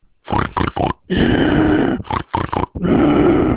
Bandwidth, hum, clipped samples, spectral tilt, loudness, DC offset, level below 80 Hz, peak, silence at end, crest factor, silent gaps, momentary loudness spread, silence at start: 4 kHz; none; under 0.1%; -11 dB/octave; -17 LUFS; under 0.1%; -30 dBFS; -2 dBFS; 0 s; 14 dB; none; 9 LU; 0.3 s